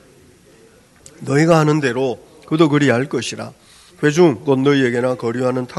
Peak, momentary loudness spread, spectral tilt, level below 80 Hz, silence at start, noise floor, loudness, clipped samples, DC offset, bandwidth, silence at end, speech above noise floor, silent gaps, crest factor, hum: 0 dBFS; 12 LU; -6 dB/octave; -58 dBFS; 1.2 s; -48 dBFS; -16 LUFS; under 0.1%; under 0.1%; 12 kHz; 0 s; 33 dB; none; 18 dB; none